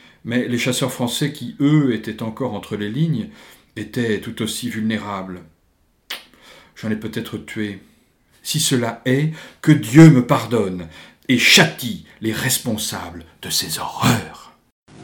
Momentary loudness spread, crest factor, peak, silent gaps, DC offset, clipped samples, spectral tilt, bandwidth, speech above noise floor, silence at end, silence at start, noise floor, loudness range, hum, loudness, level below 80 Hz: 21 LU; 20 dB; 0 dBFS; 14.72-14.86 s; under 0.1%; under 0.1%; -4.5 dB/octave; 19 kHz; 42 dB; 0 s; 0.25 s; -61 dBFS; 13 LU; none; -18 LUFS; -52 dBFS